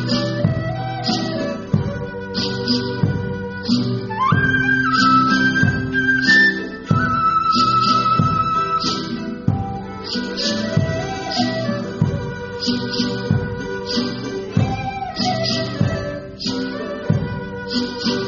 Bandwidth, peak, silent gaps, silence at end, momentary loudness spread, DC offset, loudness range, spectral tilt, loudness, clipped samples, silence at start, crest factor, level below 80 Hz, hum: 7.2 kHz; 0 dBFS; none; 0 s; 11 LU; under 0.1%; 7 LU; -3.5 dB/octave; -19 LUFS; under 0.1%; 0 s; 18 dB; -42 dBFS; none